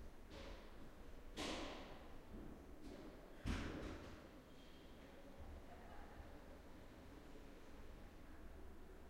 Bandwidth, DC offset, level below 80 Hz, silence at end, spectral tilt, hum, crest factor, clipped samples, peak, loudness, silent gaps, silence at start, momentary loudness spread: 16 kHz; under 0.1%; -58 dBFS; 0 s; -5 dB/octave; none; 22 dB; under 0.1%; -32 dBFS; -56 LUFS; none; 0 s; 13 LU